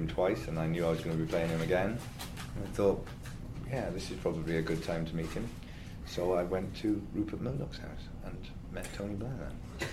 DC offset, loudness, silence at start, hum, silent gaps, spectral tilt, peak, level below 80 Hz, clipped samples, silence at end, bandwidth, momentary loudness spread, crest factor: under 0.1%; -35 LUFS; 0 s; none; none; -6.5 dB/octave; -16 dBFS; -46 dBFS; under 0.1%; 0 s; 15.5 kHz; 13 LU; 20 dB